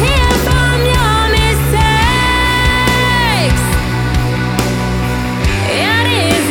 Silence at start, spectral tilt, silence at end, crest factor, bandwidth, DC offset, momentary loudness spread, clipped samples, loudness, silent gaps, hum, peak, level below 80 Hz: 0 s; -4.5 dB/octave; 0 s; 12 dB; 19 kHz; under 0.1%; 4 LU; under 0.1%; -12 LUFS; none; none; 0 dBFS; -18 dBFS